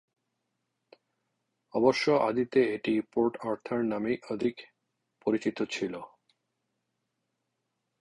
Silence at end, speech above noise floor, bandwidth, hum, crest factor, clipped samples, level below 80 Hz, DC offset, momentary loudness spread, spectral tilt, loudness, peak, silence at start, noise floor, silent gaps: 1.95 s; 54 dB; 11 kHz; none; 22 dB; under 0.1%; -70 dBFS; under 0.1%; 10 LU; -5.5 dB/octave; -29 LUFS; -10 dBFS; 1.75 s; -82 dBFS; none